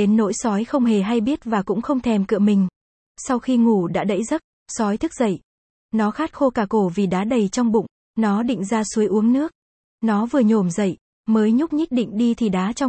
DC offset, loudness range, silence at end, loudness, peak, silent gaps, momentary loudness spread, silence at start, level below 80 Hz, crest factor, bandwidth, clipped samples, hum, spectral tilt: under 0.1%; 2 LU; 0 s; -20 LUFS; -6 dBFS; 2.76-3.15 s, 4.44-4.66 s, 5.44-5.89 s, 7.91-8.14 s, 9.55-9.98 s, 11.01-11.24 s; 7 LU; 0 s; -54 dBFS; 14 dB; 8.8 kHz; under 0.1%; none; -6.5 dB/octave